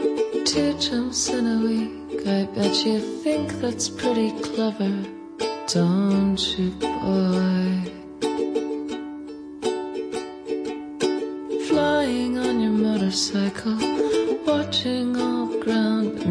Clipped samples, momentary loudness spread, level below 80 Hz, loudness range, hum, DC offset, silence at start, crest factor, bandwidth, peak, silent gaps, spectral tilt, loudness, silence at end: under 0.1%; 9 LU; -54 dBFS; 5 LU; none; under 0.1%; 0 s; 14 dB; 10.5 kHz; -10 dBFS; none; -5 dB/octave; -23 LUFS; 0 s